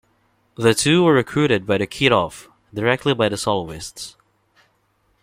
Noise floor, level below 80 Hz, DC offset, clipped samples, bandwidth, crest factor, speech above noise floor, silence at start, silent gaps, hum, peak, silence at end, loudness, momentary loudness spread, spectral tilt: -64 dBFS; -52 dBFS; under 0.1%; under 0.1%; 16 kHz; 18 dB; 46 dB; 0.6 s; none; none; -2 dBFS; 1.1 s; -18 LUFS; 16 LU; -4.5 dB/octave